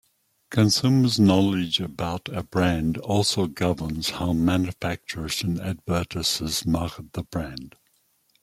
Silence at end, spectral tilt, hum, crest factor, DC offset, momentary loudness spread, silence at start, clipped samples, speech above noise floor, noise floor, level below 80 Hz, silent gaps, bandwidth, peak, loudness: 0.75 s; -5 dB/octave; none; 18 dB; under 0.1%; 12 LU; 0.5 s; under 0.1%; 43 dB; -66 dBFS; -48 dBFS; none; 16 kHz; -6 dBFS; -24 LUFS